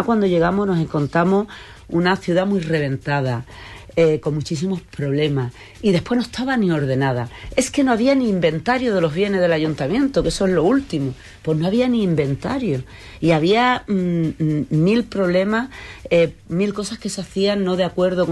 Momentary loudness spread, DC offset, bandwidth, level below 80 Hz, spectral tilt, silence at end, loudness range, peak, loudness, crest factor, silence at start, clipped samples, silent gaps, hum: 8 LU; under 0.1%; 12.5 kHz; -44 dBFS; -6.5 dB/octave; 0 s; 3 LU; -4 dBFS; -19 LUFS; 16 dB; 0 s; under 0.1%; none; none